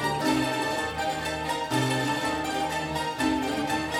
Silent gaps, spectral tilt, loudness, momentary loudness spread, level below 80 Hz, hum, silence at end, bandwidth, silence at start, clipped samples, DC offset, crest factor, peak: none; -4 dB/octave; -27 LUFS; 4 LU; -50 dBFS; none; 0 s; 16.5 kHz; 0 s; under 0.1%; under 0.1%; 16 dB; -12 dBFS